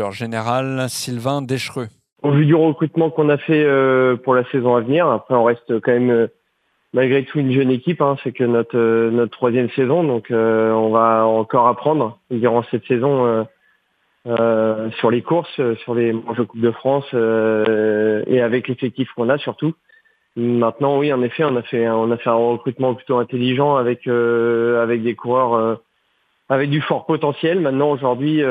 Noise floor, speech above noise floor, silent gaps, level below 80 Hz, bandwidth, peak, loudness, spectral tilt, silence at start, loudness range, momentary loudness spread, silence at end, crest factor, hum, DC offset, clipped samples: -66 dBFS; 49 dB; 2.12-2.16 s; -68 dBFS; 13.5 kHz; 0 dBFS; -18 LUFS; -7 dB/octave; 0 s; 3 LU; 7 LU; 0 s; 16 dB; none; under 0.1%; under 0.1%